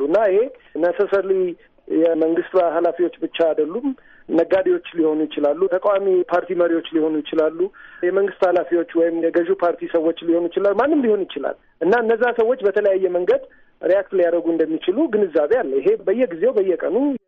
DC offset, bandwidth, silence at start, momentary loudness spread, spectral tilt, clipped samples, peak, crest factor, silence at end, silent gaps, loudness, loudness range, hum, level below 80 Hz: under 0.1%; 5.4 kHz; 0 s; 5 LU; -7.5 dB/octave; under 0.1%; -8 dBFS; 12 dB; 0.1 s; none; -19 LUFS; 1 LU; none; -60 dBFS